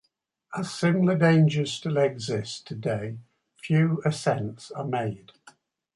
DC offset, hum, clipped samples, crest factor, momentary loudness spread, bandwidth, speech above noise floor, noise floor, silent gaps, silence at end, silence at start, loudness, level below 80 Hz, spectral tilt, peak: under 0.1%; none; under 0.1%; 18 dB; 15 LU; 11.5 kHz; 47 dB; -72 dBFS; none; 0.8 s; 0.5 s; -26 LUFS; -64 dBFS; -6.5 dB/octave; -8 dBFS